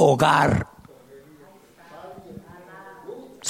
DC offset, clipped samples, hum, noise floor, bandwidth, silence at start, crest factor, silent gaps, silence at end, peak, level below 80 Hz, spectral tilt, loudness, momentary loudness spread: under 0.1%; under 0.1%; none; -50 dBFS; 15.5 kHz; 0 s; 20 dB; none; 0 s; -6 dBFS; -50 dBFS; -5 dB/octave; -19 LUFS; 26 LU